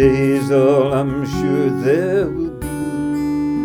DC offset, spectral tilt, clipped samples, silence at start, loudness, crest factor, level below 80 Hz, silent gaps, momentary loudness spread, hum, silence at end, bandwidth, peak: under 0.1%; -7.5 dB/octave; under 0.1%; 0 s; -17 LUFS; 14 dB; -38 dBFS; none; 9 LU; none; 0 s; 17.5 kHz; -2 dBFS